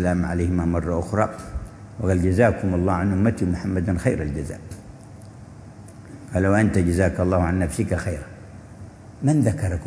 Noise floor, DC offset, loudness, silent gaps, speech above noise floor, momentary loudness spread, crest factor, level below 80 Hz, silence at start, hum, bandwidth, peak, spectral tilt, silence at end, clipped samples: -41 dBFS; under 0.1%; -22 LUFS; none; 20 dB; 23 LU; 20 dB; -38 dBFS; 0 s; none; 11 kHz; -4 dBFS; -8 dB/octave; 0 s; under 0.1%